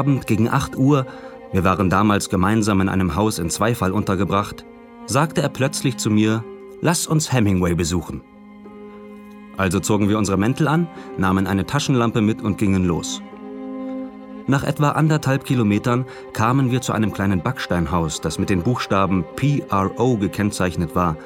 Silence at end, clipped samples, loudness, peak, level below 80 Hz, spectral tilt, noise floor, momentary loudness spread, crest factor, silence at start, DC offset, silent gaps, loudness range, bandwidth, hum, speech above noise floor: 0 s; under 0.1%; -20 LUFS; -2 dBFS; -44 dBFS; -6 dB/octave; -40 dBFS; 13 LU; 18 dB; 0 s; under 0.1%; none; 3 LU; 17 kHz; none; 21 dB